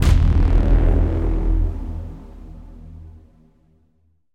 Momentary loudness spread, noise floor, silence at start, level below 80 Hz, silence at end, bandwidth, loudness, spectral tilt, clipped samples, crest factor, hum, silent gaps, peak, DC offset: 24 LU; -63 dBFS; 0 s; -20 dBFS; 1.25 s; 8.8 kHz; -20 LUFS; -8 dB/octave; under 0.1%; 16 dB; none; none; -2 dBFS; under 0.1%